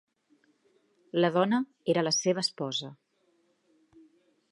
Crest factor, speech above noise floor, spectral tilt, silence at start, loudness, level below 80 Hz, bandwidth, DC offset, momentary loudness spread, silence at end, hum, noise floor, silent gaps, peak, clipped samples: 22 dB; 43 dB; -4 dB/octave; 1.15 s; -28 LUFS; -82 dBFS; 11.5 kHz; under 0.1%; 9 LU; 1.6 s; none; -71 dBFS; none; -10 dBFS; under 0.1%